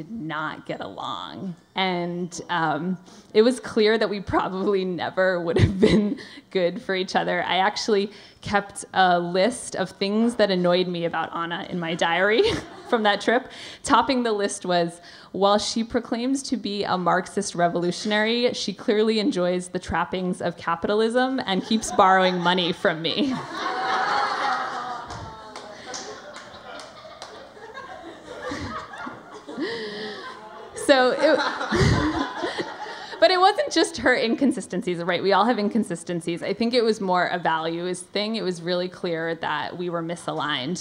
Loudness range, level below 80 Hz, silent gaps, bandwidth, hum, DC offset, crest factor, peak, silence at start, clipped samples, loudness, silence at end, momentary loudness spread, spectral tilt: 8 LU; -48 dBFS; none; 15.5 kHz; none; under 0.1%; 22 dB; -2 dBFS; 0 s; under 0.1%; -23 LUFS; 0 s; 16 LU; -4.5 dB/octave